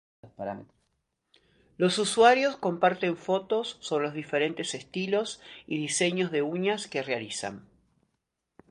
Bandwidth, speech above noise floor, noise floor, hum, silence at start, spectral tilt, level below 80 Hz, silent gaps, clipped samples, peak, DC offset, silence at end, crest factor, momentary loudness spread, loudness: 11.5 kHz; 53 dB; -81 dBFS; none; 0.25 s; -4 dB/octave; -72 dBFS; none; under 0.1%; -6 dBFS; under 0.1%; 1.1 s; 22 dB; 16 LU; -28 LUFS